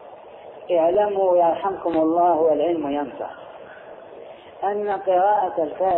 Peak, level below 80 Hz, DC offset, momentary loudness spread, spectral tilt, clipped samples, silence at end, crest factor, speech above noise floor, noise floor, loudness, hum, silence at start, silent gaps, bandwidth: -8 dBFS; -62 dBFS; under 0.1%; 23 LU; -9.5 dB/octave; under 0.1%; 0 s; 12 dB; 21 dB; -41 dBFS; -21 LUFS; none; 0 s; none; 4.1 kHz